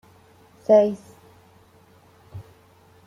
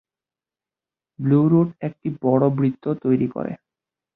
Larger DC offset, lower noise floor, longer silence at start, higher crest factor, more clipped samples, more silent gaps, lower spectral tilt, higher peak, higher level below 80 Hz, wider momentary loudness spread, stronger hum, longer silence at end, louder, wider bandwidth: neither; second, -54 dBFS vs under -90 dBFS; second, 0.7 s vs 1.2 s; about the same, 22 dB vs 18 dB; neither; neither; second, -7.5 dB/octave vs -13 dB/octave; about the same, -4 dBFS vs -4 dBFS; about the same, -66 dBFS vs -62 dBFS; first, 26 LU vs 12 LU; neither; about the same, 0.65 s vs 0.6 s; about the same, -19 LUFS vs -21 LUFS; first, 10 kHz vs 4.1 kHz